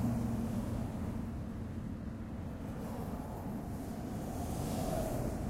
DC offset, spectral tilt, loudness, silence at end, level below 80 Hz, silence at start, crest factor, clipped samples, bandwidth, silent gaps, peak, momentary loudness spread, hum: under 0.1%; -7 dB/octave; -40 LUFS; 0 s; -46 dBFS; 0 s; 14 dB; under 0.1%; 16 kHz; none; -24 dBFS; 6 LU; none